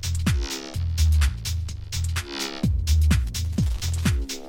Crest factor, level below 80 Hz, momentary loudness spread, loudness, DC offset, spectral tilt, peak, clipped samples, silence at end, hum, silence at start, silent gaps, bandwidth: 16 dB; -26 dBFS; 8 LU; -25 LUFS; under 0.1%; -4.5 dB/octave; -8 dBFS; under 0.1%; 0 s; none; 0 s; none; 17 kHz